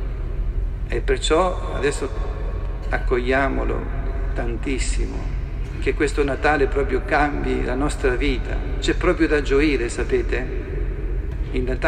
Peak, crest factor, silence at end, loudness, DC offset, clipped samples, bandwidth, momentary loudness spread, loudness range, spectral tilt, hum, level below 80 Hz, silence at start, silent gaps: -4 dBFS; 16 dB; 0 s; -23 LUFS; under 0.1%; under 0.1%; 10 kHz; 10 LU; 3 LU; -5.5 dB/octave; none; -24 dBFS; 0 s; none